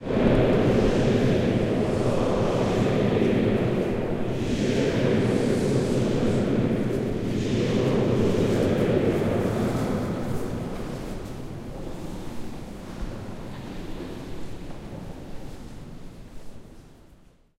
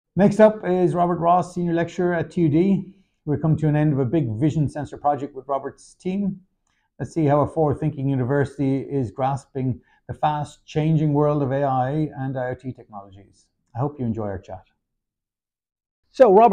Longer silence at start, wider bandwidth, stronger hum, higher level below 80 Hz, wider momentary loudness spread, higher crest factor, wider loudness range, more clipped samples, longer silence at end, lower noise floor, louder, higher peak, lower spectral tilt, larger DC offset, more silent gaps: second, 0 s vs 0.15 s; first, 15.5 kHz vs 9.8 kHz; neither; first, -38 dBFS vs -52 dBFS; about the same, 17 LU vs 17 LU; about the same, 18 dB vs 18 dB; first, 15 LU vs 8 LU; neither; first, 0.65 s vs 0 s; second, -54 dBFS vs under -90 dBFS; about the same, -24 LUFS vs -22 LUFS; about the same, -6 dBFS vs -4 dBFS; second, -7 dB/octave vs -8.5 dB/octave; neither; second, none vs 15.91-16.03 s